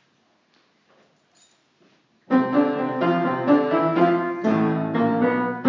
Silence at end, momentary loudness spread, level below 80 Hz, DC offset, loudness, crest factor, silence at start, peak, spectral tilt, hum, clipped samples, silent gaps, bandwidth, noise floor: 0 s; 4 LU; -78 dBFS; under 0.1%; -21 LUFS; 18 dB; 2.3 s; -4 dBFS; -8.5 dB/octave; none; under 0.1%; none; 7.4 kHz; -64 dBFS